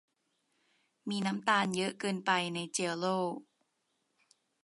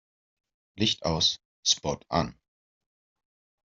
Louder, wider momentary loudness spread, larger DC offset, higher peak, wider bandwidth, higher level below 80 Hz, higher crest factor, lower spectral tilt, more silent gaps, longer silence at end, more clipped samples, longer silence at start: second, -33 LUFS vs -27 LUFS; first, 9 LU vs 5 LU; neither; second, -14 dBFS vs -8 dBFS; first, 11.5 kHz vs 7.8 kHz; second, -82 dBFS vs -56 dBFS; about the same, 22 dB vs 22 dB; about the same, -4 dB/octave vs -3 dB/octave; second, none vs 1.45-1.63 s; second, 1.2 s vs 1.35 s; neither; first, 1.05 s vs 0.75 s